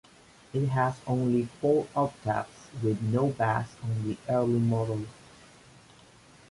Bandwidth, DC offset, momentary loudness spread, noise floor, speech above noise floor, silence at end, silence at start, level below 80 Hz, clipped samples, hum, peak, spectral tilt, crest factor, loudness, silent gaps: 11.5 kHz; under 0.1%; 7 LU; -56 dBFS; 28 dB; 1.4 s; 0.55 s; -60 dBFS; under 0.1%; none; -12 dBFS; -8 dB/octave; 16 dB; -29 LUFS; none